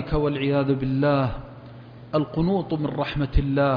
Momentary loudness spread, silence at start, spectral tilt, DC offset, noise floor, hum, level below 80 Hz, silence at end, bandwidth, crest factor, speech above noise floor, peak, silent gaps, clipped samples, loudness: 19 LU; 0 s; -10 dB/octave; under 0.1%; -42 dBFS; none; -34 dBFS; 0 s; 5.2 kHz; 16 dB; 20 dB; -8 dBFS; none; under 0.1%; -24 LUFS